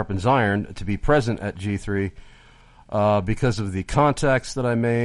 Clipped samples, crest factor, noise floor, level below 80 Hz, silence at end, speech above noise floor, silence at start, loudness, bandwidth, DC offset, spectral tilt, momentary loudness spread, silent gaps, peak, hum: under 0.1%; 18 dB; -50 dBFS; -38 dBFS; 0 s; 29 dB; 0 s; -22 LUFS; 11.5 kHz; under 0.1%; -6.5 dB/octave; 8 LU; none; -4 dBFS; none